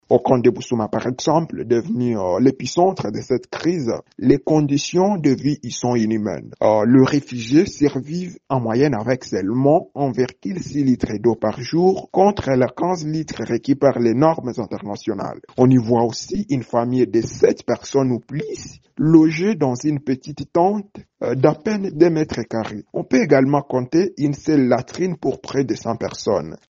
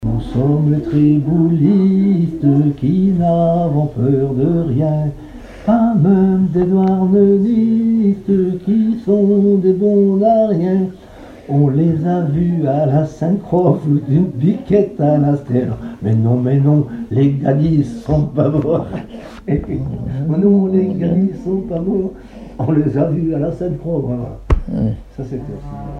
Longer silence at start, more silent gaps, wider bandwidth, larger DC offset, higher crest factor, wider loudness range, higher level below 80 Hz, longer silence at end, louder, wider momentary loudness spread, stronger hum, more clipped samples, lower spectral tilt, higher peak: about the same, 0.1 s vs 0 s; neither; first, 7.6 kHz vs 6.4 kHz; neither; about the same, 18 dB vs 14 dB; about the same, 2 LU vs 4 LU; second, -52 dBFS vs -34 dBFS; first, 0.15 s vs 0 s; second, -19 LUFS vs -15 LUFS; about the same, 10 LU vs 10 LU; neither; neither; second, -7 dB/octave vs -11 dB/octave; about the same, 0 dBFS vs 0 dBFS